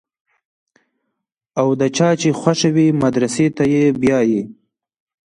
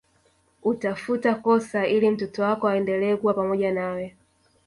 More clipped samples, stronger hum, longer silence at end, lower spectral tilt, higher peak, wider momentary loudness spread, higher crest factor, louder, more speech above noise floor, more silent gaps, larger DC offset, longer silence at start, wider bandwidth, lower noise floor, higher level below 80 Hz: neither; neither; first, 0.75 s vs 0.6 s; about the same, -6 dB/octave vs -7 dB/octave; first, -2 dBFS vs -10 dBFS; about the same, 5 LU vs 7 LU; about the same, 16 dB vs 16 dB; first, -16 LUFS vs -24 LUFS; first, 62 dB vs 41 dB; neither; neither; first, 1.55 s vs 0.65 s; about the same, 11 kHz vs 11.5 kHz; first, -77 dBFS vs -64 dBFS; first, -54 dBFS vs -64 dBFS